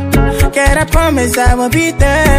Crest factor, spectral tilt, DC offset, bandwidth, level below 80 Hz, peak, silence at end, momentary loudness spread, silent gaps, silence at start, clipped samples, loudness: 10 dB; -5 dB/octave; under 0.1%; 16 kHz; -14 dBFS; 0 dBFS; 0 s; 2 LU; none; 0 s; under 0.1%; -11 LUFS